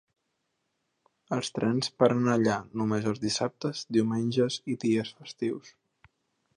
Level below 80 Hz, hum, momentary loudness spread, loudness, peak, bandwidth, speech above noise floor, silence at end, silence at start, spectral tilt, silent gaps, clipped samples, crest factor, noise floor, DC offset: -68 dBFS; none; 9 LU; -28 LUFS; -8 dBFS; 11 kHz; 51 dB; 0.9 s; 1.3 s; -5.5 dB/octave; none; under 0.1%; 22 dB; -79 dBFS; under 0.1%